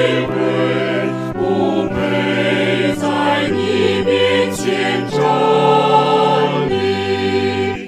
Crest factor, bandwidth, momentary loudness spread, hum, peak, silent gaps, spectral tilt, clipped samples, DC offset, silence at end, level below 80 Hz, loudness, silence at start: 14 dB; 14 kHz; 5 LU; none; 0 dBFS; none; -5.5 dB/octave; under 0.1%; under 0.1%; 0 s; -46 dBFS; -15 LUFS; 0 s